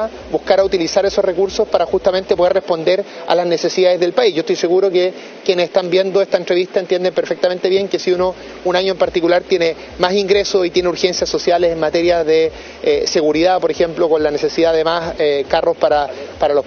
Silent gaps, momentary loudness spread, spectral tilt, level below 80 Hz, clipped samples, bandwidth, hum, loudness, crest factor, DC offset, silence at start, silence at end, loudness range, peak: none; 4 LU; -4.5 dB/octave; -44 dBFS; under 0.1%; 6.8 kHz; none; -16 LUFS; 16 dB; under 0.1%; 0 s; 0 s; 1 LU; 0 dBFS